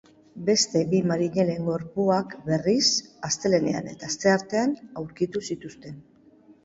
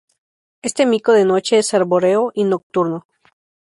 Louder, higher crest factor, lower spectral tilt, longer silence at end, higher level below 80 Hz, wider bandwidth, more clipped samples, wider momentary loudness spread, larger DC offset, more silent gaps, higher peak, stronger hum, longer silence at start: second, -25 LUFS vs -16 LUFS; about the same, 18 dB vs 14 dB; about the same, -4 dB/octave vs -4.5 dB/octave; about the same, 0.65 s vs 0.65 s; about the same, -62 dBFS vs -64 dBFS; second, 8 kHz vs 11.5 kHz; neither; first, 13 LU vs 10 LU; neither; second, none vs 2.63-2.70 s; second, -6 dBFS vs -2 dBFS; neither; second, 0.35 s vs 0.65 s